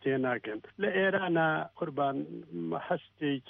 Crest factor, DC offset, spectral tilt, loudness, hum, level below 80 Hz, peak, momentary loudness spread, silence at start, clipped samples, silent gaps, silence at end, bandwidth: 16 dB; under 0.1%; -9.5 dB/octave; -32 LUFS; none; -74 dBFS; -16 dBFS; 11 LU; 0 s; under 0.1%; none; 0.1 s; 4.2 kHz